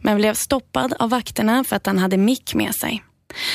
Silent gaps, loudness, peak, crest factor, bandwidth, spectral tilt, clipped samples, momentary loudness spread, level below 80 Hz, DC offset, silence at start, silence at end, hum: none; -20 LUFS; -4 dBFS; 16 dB; 16 kHz; -4.5 dB/octave; under 0.1%; 8 LU; -50 dBFS; under 0.1%; 0 s; 0 s; none